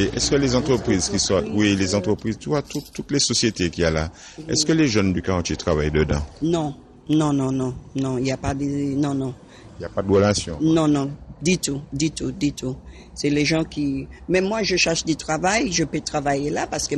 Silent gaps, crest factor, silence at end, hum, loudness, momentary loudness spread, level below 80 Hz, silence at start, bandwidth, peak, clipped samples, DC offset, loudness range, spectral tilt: none; 16 dB; 0 s; none; -22 LUFS; 9 LU; -40 dBFS; 0 s; 13 kHz; -6 dBFS; under 0.1%; under 0.1%; 3 LU; -4.5 dB/octave